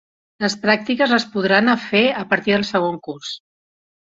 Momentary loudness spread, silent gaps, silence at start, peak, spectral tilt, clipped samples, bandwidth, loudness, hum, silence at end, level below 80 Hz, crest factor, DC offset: 13 LU; none; 0.4 s; -2 dBFS; -4.5 dB/octave; under 0.1%; 7.8 kHz; -18 LUFS; none; 0.8 s; -60 dBFS; 18 dB; under 0.1%